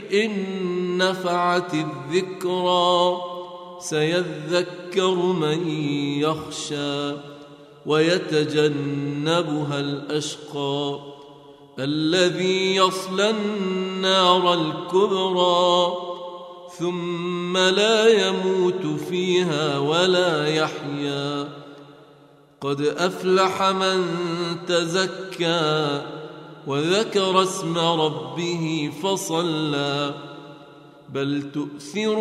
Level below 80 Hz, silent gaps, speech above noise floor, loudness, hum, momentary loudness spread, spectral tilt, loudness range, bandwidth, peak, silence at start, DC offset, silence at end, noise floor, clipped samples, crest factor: -68 dBFS; none; 30 dB; -22 LUFS; none; 12 LU; -4.5 dB/octave; 5 LU; 14 kHz; -4 dBFS; 0 s; under 0.1%; 0 s; -52 dBFS; under 0.1%; 20 dB